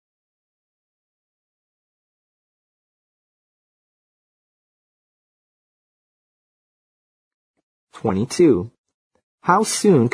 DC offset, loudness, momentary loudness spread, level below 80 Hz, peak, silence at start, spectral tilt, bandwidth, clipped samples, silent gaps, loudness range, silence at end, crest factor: under 0.1%; -18 LUFS; 11 LU; -62 dBFS; -2 dBFS; 7.95 s; -5.5 dB/octave; 11 kHz; under 0.1%; 8.78-8.84 s, 8.94-9.11 s, 9.23-9.38 s; 11 LU; 0.05 s; 24 dB